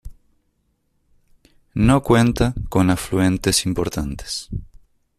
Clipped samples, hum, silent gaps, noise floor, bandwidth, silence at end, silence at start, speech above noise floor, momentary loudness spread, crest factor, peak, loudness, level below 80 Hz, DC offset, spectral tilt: under 0.1%; none; none; -67 dBFS; 14.5 kHz; 0.55 s; 0.05 s; 49 dB; 13 LU; 18 dB; -2 dBFS; -19 LUFS; -36 dBFS; under 0.1%; -5 dB/octave